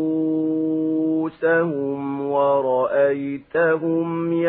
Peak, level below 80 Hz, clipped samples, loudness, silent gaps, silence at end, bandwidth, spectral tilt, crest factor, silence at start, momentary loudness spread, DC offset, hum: -8 dBFS; -66 dBFS; under 0.1%; -21 LUFS; none; 0 s; 4 kHz; -12 dB/octave; 12 dB; 0 s; 6 LU; under 0.1%; none